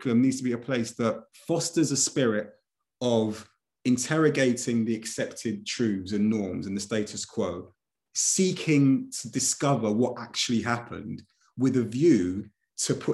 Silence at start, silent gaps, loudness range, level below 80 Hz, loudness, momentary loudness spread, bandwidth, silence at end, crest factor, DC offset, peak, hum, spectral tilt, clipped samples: 0 s; none; 3 LU; -72 dBFS; -26 LUFS; 10 LU; 12.5 kHz; 0 s; 18 dB; under 0.1%; -10 dBFS; none; -4.5 dB/octave; under 0.1%